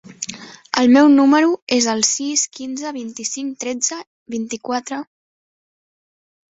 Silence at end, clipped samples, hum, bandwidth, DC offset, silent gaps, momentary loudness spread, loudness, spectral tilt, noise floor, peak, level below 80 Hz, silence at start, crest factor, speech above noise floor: 1.45 s; under 0.1%; none; 8 kHz; under 0.1%; 1.62-1.67 s, 4.07-4.26 s; 18 LU; -17 LUFS; -2 dB/octave; under -90 dBFS; -2 dBFS; -64 dBFS; 0.05 s; 18 dB; over 73 dB